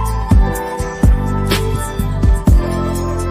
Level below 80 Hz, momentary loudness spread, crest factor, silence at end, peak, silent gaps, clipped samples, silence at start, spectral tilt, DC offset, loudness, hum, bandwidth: -16 dBFS; 6 LU; 12 dB; 0 s; -2 dBFS; none; under 0.1%; 0 s; -6.5 dB/octave; under 0.1%; -16 LUFS; none; 15.5 kHz